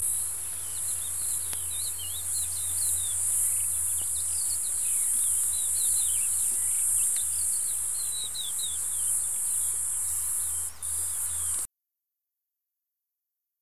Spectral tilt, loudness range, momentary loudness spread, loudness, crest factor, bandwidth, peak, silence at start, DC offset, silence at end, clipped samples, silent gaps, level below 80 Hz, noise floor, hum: 1 dB/octave; 5 LU; 6 LU; -26 LUFS; 20 dB; 16 kHz; -10 dBFS; 0 s; 0.7%; 0 s; under 0.1%; none; -56 dBFS; -85 dBFS; none